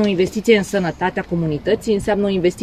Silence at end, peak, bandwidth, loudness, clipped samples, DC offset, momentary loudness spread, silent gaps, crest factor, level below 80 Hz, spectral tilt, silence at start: 0 s; -2 dBFS; 14 kHz; -18 LUFS; under 0.1%; 0.2%; 6 LU; none; 16 dB; -42 dBFS; -6 dB/octave; 0 s